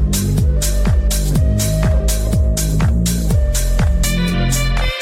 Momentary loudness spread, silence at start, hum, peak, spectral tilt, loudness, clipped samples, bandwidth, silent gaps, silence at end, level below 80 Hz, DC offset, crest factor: 1 LU; 0 s; none; -6 dBFS; -5 dB/octave; -16 LUFS; under 0.1%; 16.5 kHz; none; 0 s; -16 dBFS; under 0.1%; 8 dB